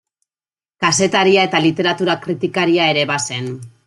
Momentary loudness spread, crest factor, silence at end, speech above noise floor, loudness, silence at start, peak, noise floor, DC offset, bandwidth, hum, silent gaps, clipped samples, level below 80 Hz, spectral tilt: 8 LU; 16 dB; 0.2 s; over 74 dB; -16 LUFS; 0.8 s; -2 dBFS; under -90 dBFS; under 0.1%; 11.5 kHz; none; none; under 0.1%; -58 dBFS; -3.5 dB/octave